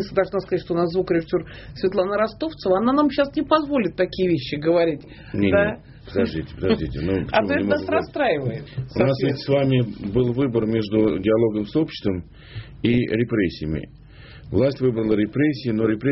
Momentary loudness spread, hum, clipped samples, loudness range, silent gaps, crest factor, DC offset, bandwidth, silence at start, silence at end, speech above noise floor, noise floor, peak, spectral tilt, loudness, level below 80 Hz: 9 LU; none; under 0.1%; 2 LU; none; 18 dB; under 0.1%; 6 kHz; 0 s; 0 s; 21 dB; -42 dBFS; -2 dBFS; -6 dB/octave; -22 LUFS; -44 dBFS